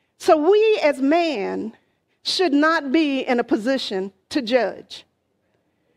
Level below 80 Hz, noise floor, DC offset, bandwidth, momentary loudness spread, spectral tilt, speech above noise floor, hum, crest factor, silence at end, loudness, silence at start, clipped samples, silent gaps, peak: -68 dBFS; -68 dBFS; under 0.1%; 13.5 kHz; 13 LU; -4 dB/octave; 49 dB; none; 18 dB; 0.95 s; -20 LUFS; 0.2 s; under 0.1%; none; -2 dBFS